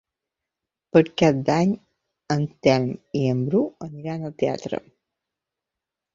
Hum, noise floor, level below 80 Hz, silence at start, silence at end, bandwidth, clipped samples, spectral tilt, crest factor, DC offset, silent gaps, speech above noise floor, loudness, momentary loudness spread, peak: none; -86 dBFS; -60 dBFS; 0.95 s; 1.35 s; 7.6 kHz; under 0.1%; -7 dB/octave; 22 dB; under 0.1%; none; 65 dB; -23 LUFS; 12 LU; -2 dBFS